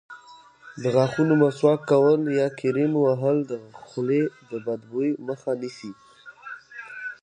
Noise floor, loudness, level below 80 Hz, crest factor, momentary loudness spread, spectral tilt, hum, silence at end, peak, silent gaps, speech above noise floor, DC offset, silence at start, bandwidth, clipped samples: -50 dBFS; -23 LUFS; -70 dBFS; 18 dB; 20 LU; -7.5 dB/octave; none; 0.1 s; -6 dBFS; none; 27 dB; under 0.1%; 0.1 s; 9.4 kHz; under 0.1%